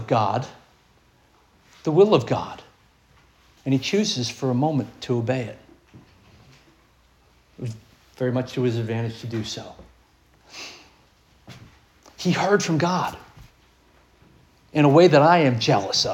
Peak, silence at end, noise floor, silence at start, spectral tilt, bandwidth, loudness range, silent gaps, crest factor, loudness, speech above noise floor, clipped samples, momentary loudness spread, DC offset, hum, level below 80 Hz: -2 dBFS; 0 s; -58 dBFS; 0 s; -5.5 dB/octave; 16.5 kHz; 12 LU; none; 22 dB; -21 LUFS; 38 dB; under 0.1%; 21 LU; under 0.1%; none; -60 dBFS